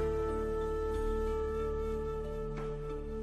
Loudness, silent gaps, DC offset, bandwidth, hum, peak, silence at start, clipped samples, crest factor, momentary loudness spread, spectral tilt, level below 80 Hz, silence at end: -36 LUFS; none; under 0.1%; 13 kHz; none; -24 dBFS; 0 s; under 0.1%; 10 dB; 5 LU; -7.5 dB/octave; -40 dBFS; 0 s